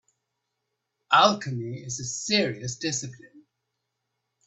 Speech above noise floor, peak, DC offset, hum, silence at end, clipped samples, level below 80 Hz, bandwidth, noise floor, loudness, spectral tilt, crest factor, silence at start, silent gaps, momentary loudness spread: 55 dB; -4 dBFS; under 0.1%; none; 1.05 s; under 0.1%; -68 dBFS; 8.4 kHz; -81 dBFS; -25 LUFS; -3 dB/octave; 24 dB; 1.1 s; none; 14 LU